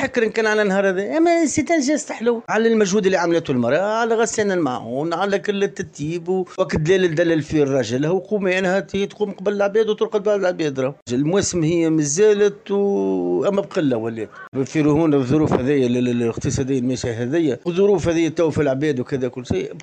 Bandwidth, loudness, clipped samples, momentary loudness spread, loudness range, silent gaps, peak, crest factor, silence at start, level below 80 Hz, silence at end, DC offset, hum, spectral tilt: 9.6 kHz; -19 LUFS; under 0.1%; 7 LU; 2 LU; 11.02-11.06 s, 14.48-14.52 s; -4 dBFS; 16 dB; 0 s; -48 dBFS; 0 s; under 0.1%; none; -5.5 dB/octave